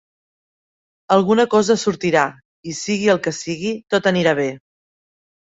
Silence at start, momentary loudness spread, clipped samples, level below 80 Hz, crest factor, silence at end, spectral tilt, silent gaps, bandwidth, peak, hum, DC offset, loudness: 1.1 s; 10 LU; under 0.1%; -60 dBFS; 18 dB; 1 s; -4.5 dB/octave; 2.45-2.63 s; 8 kHz; -2 dBFS; none; under 0.1%; -18 LUFS